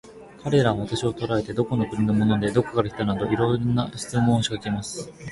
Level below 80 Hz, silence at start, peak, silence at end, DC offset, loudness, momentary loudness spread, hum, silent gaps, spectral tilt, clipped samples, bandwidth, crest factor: -48 dBFS; 0.05 s; -6 dBFS; 0 s; under 0.1%; -24 LUFS; 8 LU; none; none; -6.5 dB/octave; under 0.1%; 11.5 kHz; 18 dB